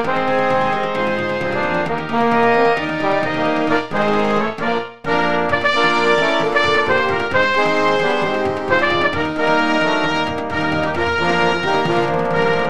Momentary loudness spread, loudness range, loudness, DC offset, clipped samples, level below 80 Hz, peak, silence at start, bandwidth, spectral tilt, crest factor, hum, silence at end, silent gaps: 5 LU; 2 LU; -17 LUFS; 3%; under 0.1%; -48 dBFS; -2 dBFS; 0 s; 11.5 kHz; -5 dB/octave; 16 dB; none; 0 s; none